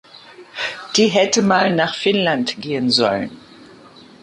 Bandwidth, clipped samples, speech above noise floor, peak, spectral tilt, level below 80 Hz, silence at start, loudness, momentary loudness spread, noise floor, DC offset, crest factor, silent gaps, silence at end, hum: 11.5 kHz; under 0.1%; 27 dB; -2 dBFS; -3.5 dB/octave; -60 dBFS; 0.3 s; -17 LUFS; 11 LU; -44 dBFS; under 0.1%; 18 dB; none; 0.85 s; none